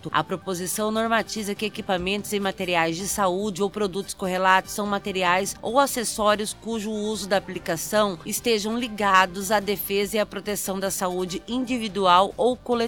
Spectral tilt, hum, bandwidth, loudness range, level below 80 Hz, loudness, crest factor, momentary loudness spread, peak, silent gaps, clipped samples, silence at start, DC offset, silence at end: -3.5 dB/octave; none; 19 kHz; 2 LU; -52 dBFS; -24 LUFS; 20 dB; 9 LU; -4 dBFS; none; under 0.1%; 0.05 s; 0.1%; 0 s